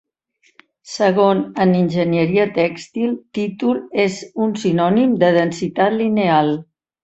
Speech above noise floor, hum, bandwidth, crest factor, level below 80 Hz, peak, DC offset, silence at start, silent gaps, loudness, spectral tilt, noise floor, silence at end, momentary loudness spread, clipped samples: 44 dB; none; 8.2 kHz; 16 dB; -58 dBFS; -2 dBFS; under 0.1%; 0.85 s; none; -17 LUFS; -6.5 dB/octave; -61 dBFS; 0.4 s; 7 LU; under 0.1%